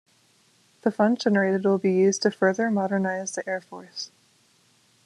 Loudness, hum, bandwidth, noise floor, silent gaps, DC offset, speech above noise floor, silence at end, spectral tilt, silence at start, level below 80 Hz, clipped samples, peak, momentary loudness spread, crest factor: -24 LUFS; none; 11.5 kHz; -62 dBFS; none; under 0.1%; 39 dB; 1 s; -5 dB/octave; 0.85 s; -72 dBFS; under 0.1%; -8 dBFS; 15 LU; 18 dB